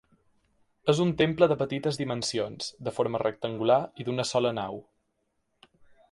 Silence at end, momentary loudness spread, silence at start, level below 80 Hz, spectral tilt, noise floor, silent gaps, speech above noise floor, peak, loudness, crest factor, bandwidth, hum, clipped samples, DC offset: 1.3 s; 10 LU; 0.85 s; -62 dBFS; -5.5 dB/octave; -76 dBFS; none; 49 dB; -8 dBFS; -28 LUFS; 22 dB; 11.5 kHz; none; under 0.1%; under 0.1%